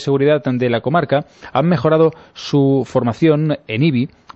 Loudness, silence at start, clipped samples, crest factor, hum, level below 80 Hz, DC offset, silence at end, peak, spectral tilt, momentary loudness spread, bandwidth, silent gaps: -16 LUFS; 0 s; under 0.1%; 14 dB; none; -54 dBFS; under 0.1%; 0.3 s; -2 dBFS; -8 dB/octave; 5 LU; 8 kHz; none